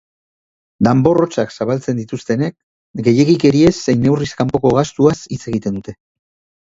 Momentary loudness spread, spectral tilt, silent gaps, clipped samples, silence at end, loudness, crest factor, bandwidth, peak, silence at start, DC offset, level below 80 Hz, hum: 11 LU; -7 dB/octave; 2.63-2.94 s; under 0.1%; 0.7 s; -15 LUFS; 16 dB; 7.8 kHz; 0 dBFS; 0.8 s; under 0.1%; -44 dBFS; none